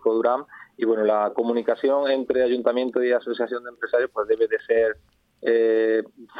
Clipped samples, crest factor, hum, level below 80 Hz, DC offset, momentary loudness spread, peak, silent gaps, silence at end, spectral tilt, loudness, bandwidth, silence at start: under 0.1%; 16 dB; none; -64 dBFS; under 0.1%; 7 LU; -6 dBFS; none; 0 s; -7 dB/octave; -23 LUFS; 4.9 kHz; 0.05 s